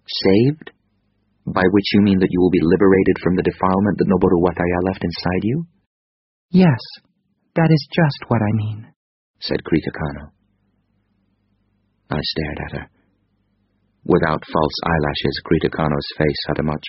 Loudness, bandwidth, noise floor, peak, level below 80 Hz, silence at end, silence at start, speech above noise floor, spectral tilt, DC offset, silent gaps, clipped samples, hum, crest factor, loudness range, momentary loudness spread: -18 LUFS; 6 kHz; -65 dBFS; -2 dBFS; -42 dBFS; 0 s; 0.1 s; 48 dB; -5.5 dB/octave; under 0.1%; 5.87-6.49 s, 8.96-9.34 s; under 0.1%; none; 18 dB; 12 LU; 13 LU